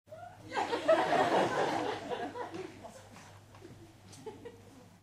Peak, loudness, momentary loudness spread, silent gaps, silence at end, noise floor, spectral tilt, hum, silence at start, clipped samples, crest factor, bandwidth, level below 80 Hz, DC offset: -16 dBFS; -32 LUFS; 25 LU; none; 0.15 s; -56 dBFS; -4.5 dB/octave; none; 0.1 s; under 0.1%; 20 dB; 15 kHz; -70 dBFS; under 0.1%